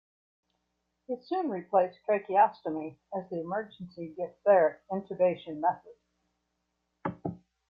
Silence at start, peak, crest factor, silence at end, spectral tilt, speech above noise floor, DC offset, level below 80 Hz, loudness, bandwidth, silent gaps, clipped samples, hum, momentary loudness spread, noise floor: 1.1 s; -12 dBFS; 20 dB; 0.35 s; -9.5 dB/octave; 51 dB; under 0.1%; -74 dBFS; -30 LUFS; 5.2 kHz; none; under 0.1%; none; 16 LU; -80 dBFS